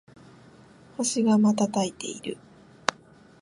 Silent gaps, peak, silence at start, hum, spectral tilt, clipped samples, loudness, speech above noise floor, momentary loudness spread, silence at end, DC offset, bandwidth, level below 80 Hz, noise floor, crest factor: none; -4 dBFS; 1 s; none; -4.5 dB/octave; under 0.1%; -26 LUFS; 29 dB; 17 LU; 0.5 s; under 0.1%; 11.5 kHz; -68 dBFS; -53 dBFS; 24 dB